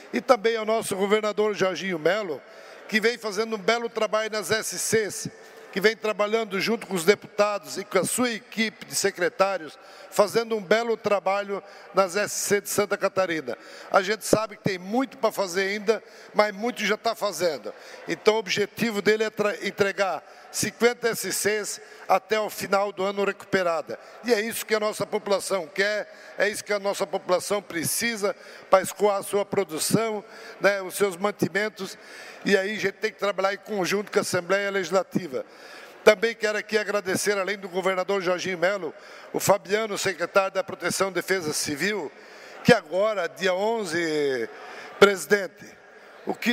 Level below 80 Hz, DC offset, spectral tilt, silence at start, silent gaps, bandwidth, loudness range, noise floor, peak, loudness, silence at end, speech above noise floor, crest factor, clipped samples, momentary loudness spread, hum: -68 dBFS; under 0.1%; -3.5 dB/octave; 0 s; none; 16 kHz; 2 LU; -48 dBFS; -4 dBFS; -25 LUFS; 0 s; 23 dB; 22 dB; under 0.1%; 10 LU; none